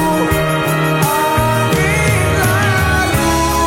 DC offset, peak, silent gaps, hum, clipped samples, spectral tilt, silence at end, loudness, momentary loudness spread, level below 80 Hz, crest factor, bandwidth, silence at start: under 0.1%; 0 dBFS; none; none; under 0.1%; -5 dB/octave; 0 s; -13 LUFS; 2 LU; -26 dBFS; 14 dB; 16.5 kHz; 0 s